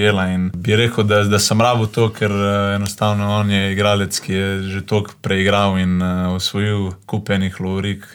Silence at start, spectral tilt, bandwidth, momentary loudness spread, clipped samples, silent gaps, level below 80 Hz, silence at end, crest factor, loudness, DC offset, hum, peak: 0 s; -5 dB/octave; 19 kHz; 7 LU; under 0.1%; none; -48 dBFS; 0.1 s; 14 dB; -17 LUFS; under 0.1%; none; -4 dBFS